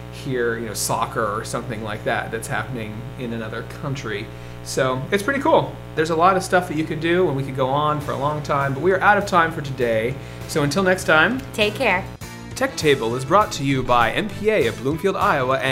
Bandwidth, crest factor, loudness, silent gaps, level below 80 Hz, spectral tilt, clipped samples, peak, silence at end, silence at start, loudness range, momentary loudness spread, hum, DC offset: 16 kHz; 20 dB; -21 LUFS; none; -42 dBFS; -5 dB/octave; under 0.1%; 0 dBFS; 0 s; 0 s; 7 LU; 12 LU; none; under 0.1%